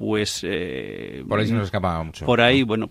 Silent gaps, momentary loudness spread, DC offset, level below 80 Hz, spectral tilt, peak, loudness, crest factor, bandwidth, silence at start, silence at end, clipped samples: none; 14 LU; under 0.1%; -46 dBFS; -5 dB/octave; 0 dBFS; -22 LUFS; 22 dB; 15.5 kHz; 0 s; 0 s; under 0.1%